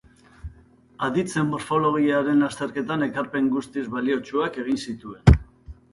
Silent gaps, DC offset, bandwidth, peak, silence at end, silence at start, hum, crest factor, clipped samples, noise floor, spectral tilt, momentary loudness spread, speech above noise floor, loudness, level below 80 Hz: none; under 0.1%; 11.5 kHz; 0 dBFS; 0.2 s; 0.45 s; none; 24 dB; under 0.1%; -53 dBFS; -7 dB/octave; 10 LU; 30 dB; -23 LUFS; -32 dBFS